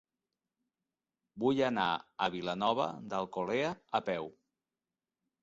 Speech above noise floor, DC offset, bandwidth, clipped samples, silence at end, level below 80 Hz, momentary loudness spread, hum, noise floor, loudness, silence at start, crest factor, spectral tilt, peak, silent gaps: over 57 dB; under 0.1%; 7.6 kHz; under 0.1%; 1.1 s; -72 dBFS; 7 LU; none; under -90 dBFS; -34 LUFS; 1.35 s; 20 dB; -3 dB/octave; -16 dBFS; none